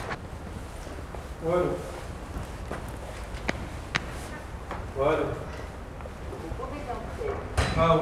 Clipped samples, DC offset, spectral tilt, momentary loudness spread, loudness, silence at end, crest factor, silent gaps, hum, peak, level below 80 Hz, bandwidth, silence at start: under 0.1%; under 0.1%; -6 dB/octave; 13 LU; -32 LUFS; 0 s; 22 dB; none; none; -8 dBFS; -40 dBFS; 15 kHz; 0 s